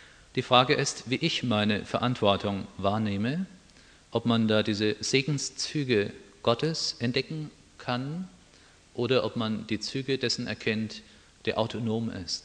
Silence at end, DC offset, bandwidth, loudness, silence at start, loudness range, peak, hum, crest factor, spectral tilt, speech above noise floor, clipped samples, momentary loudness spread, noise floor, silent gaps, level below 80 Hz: 0.05 s; under 0.1%; 10 kHz; -28 LUFS; 0 s; 5 LU; -4 dBFS; none; 24 dB; -4.5 dB/octave; 29 dB; under 0.1%; 11 LU; -57 dBFS; none; -62 dBFS